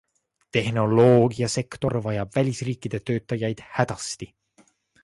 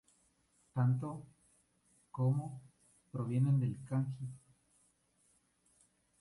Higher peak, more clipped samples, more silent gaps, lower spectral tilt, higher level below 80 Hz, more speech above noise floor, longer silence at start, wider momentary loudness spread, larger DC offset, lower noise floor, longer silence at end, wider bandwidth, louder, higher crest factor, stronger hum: first, -4 dBFS vs -24 dBFS; neither; neither; second, -6 dB/octave vs -9.5 dB/octave; first, -54 dBFS vs -74 dBFS; about the same, 38 dB vs 40 dB; second, 0.55 s vs 0.75 s; second, 13 LU vs 18 LU; neither; second, -61 dBFS vs -74 dBFS; second, 0.8 s vs 1.85 s; about the same, 11.5 kHz vs 11.5 kHz; first, -24 LUFS vs -36 LUFS; about the same, 20 dB vs 16 dB; second, none vs 60 Hz at -65 dBFS